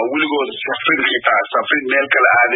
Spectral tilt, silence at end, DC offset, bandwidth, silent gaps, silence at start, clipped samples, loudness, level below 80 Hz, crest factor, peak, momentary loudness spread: -8.5 dB/octave; 0 s; under 0.1%; 4 kHz; none; 0 s; under 0.1%; -15 LUFS; -66 dBFS; 16 dB; 0 dBFS; 7 LU